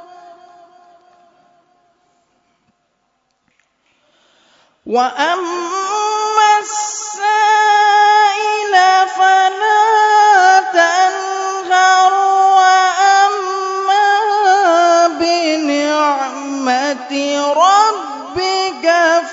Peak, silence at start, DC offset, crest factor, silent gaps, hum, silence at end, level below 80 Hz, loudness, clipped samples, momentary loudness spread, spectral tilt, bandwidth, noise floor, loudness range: 0 dBFS; 0.25 s; under 0.1%; 14 dB; none; none; 0 s; -64 dBFS; -12 LUFS; under 0.1%; 10 LU; -0.5 dB/octave; 7.8 kHz; -65 dBFS; 8 LU